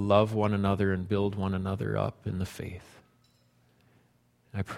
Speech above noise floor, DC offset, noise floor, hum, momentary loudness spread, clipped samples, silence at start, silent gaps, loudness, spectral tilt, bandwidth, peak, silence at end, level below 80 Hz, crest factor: 38 dB; under 0.1%; -67 dBFS; 60 Hz at -65 dBFS; 15 LU; under 0.1%; 0 s; none; -30 LUFS; -7.5 dB/octave; 13.5 kHz; -8 dBFS; 0 s; -56 dBFS; 22 dB